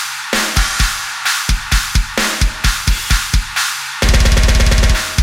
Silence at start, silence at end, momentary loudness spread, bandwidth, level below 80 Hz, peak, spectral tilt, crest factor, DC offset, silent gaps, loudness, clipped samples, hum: 0 s; 0 s; 5 LU; 16.5 kHz; -16 dBFS; 0 dBFS; -3 dB/octave; 14 dB; under 0.1%; none; -15 LUFS; under 0.1%; none